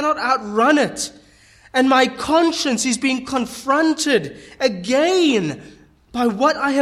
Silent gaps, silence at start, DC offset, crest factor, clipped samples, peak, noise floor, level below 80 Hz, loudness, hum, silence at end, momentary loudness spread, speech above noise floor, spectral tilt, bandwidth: none; 0 s; under 0.1%; 16 dB; under 0.1%; -4 dBFS; -50 dBFS; -54 dBFS; -18 LUFS; none; 0 s; 9 LU; 32 dB; -3.5 dB/octave; 13.5 kHz